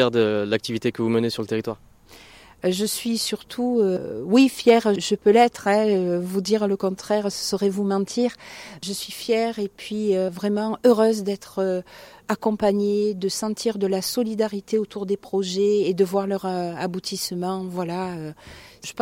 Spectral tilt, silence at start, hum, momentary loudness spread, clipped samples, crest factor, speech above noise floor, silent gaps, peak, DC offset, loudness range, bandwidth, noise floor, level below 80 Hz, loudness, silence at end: -5 dB/octave; 0 s; none; 11 LU; under 0.1%; 20 dB; 26 dB; none; -2 dBFS; under 0.1%; 5 LU; 16.5 kHz; -48 dBFS; -60 dBFS; -23 LUFS; 0 s